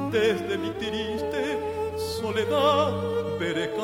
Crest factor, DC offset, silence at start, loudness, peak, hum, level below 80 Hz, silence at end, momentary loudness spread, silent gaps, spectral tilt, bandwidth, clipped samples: 16 dB; under 0.1%; 0 s; -26 LUFS; -10 dBFS; none; -54 dBFS; 0 s; 8 LU; none; -5 dB/octave; 16.5 kHz; under 0.1%